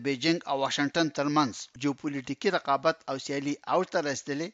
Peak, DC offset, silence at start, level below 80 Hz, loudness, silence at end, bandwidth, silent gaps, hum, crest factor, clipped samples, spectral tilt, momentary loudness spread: -10 dBFS; under 0.1%; 0 s; -72 dBFS; -29 LUFS; 0.05 s; 8 kHz; none; none; 18 dB; under 0.1%; -4.5 dB/octave; 6 LU